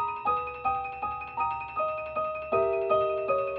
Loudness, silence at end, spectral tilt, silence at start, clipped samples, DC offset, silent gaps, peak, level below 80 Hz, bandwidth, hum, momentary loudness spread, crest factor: -29 LUFS; 0 s; -3.5 dB/octave; 0 s; under 0.1%; under 0.1%; none; -14 dBFS; -58 dBFS; 5.6 kHz; none; 6 LU; 16 dB